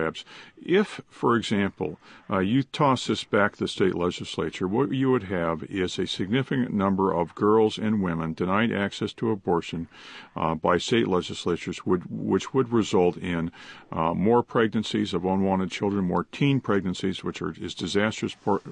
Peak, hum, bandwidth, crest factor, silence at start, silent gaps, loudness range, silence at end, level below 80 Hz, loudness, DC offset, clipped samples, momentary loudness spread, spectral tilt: -6 dBFS; none; 10 kHz; 18 dB; 0 s; none; 2 LU; 0 s; -52 dBFS; -26 LUFS; under 0.1%; under 0.1%; 9 LU; -6 dB/octave